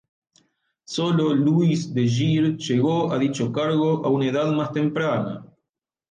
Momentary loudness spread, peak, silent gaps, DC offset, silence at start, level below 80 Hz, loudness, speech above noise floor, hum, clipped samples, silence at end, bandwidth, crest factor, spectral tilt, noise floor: 5 LU; -10 dBFS; none; under 0.1%; 0.9 s; -62 dBFS; -22 LUFS; 62 dB; none; under 0.1%; 0.65 s; 9.4 kHz; 12 dB; -7 dB/octave; -83 dBFS